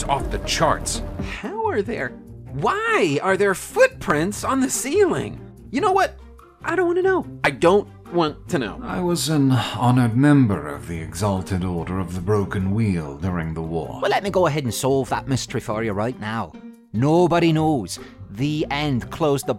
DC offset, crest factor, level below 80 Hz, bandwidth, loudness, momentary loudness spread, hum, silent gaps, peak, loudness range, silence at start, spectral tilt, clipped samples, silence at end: under 0.1%; 18 dB; -42 dBFS; 16.5 kHz; -21 LUFS; 11 LU; none; none; -4 dBFS; 3 LU; 0 s; -5.5 dB/octave; under 0.1%; 0 s